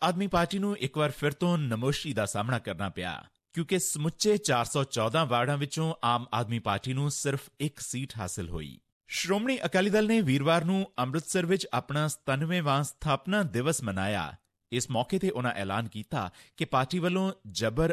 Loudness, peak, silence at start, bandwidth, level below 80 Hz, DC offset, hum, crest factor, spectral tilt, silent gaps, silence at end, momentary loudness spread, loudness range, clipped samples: -29 LUFS; -14 dBFS; 0 s; 16 kHz; -54 dBFS; under 0.1%; none; 16 dB; -5 dB/octave; 8.92-9.01 s; 0 s; 10 LU; 4 LU; under 0.1%